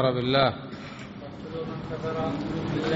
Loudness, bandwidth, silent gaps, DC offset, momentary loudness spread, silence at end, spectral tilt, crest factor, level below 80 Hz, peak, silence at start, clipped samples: -28 LUFS; 7.6 kHz; none; under 0.1%; 17 LU; 0 s; -4.5 dB/octave; 20 dB; -52 dBFS; -8 dBFS; 0 s; under 0.1%